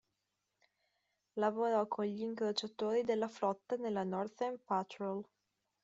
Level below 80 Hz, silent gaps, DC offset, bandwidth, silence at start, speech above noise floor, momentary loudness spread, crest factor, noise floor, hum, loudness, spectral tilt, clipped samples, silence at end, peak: -84 dBFS; none; under 0.1%; 7.8 kHz; 1.35 s; 49 dB; 7 LU; 18 dB; -86 dBFS; none; -37 LUFS; -4 dB/octave; under 0.1%; 0.6 s; -22 dBFS